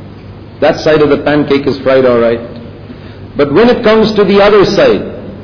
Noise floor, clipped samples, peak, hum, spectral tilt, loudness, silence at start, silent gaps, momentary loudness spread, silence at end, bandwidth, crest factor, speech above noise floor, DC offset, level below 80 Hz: -29 dBFS; under 0.1%; 0 dBFS; none; -6.5 dB/octave; -9 LUFS; 0 s; none; 20 LU; 0 s; 5.4 kHz; 10 dB; 21 dB; 0.7%; -36 dBFS